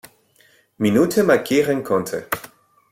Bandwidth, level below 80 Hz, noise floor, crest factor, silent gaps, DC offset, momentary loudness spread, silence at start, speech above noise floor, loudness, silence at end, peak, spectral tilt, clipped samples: 16.5 kHz; -58 dBFS; -57 dBFS; 18 dB; none; under 0.1%; 10 LU; 0.8 s; 39 dB; -19 LUFS; 0.45 s; -4 dBFS; -5.5 dB/octave; under 0.1%